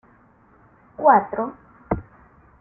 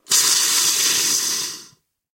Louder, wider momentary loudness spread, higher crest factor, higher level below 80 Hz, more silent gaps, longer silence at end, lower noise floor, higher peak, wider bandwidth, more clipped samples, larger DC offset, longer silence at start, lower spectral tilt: second, -21 LUFS vs -16 LUFS; about the same, 13 LU vs 12 LU; about the same, 22 dB vs 18 dB; first, -48 dBFS vs -66 dBFS; neither; about the same, 0.6 s vs 0.5 s; about the same, -55 dBFS vs -52 dBFS; about the same, -2 dBFS vs -2 dBFS; second, 2.7 kHz vs 16.5 kHz; neither; neither; first, 1 s vs 0.1 s; first, -12.5 dB/octave vs 2 dB/octave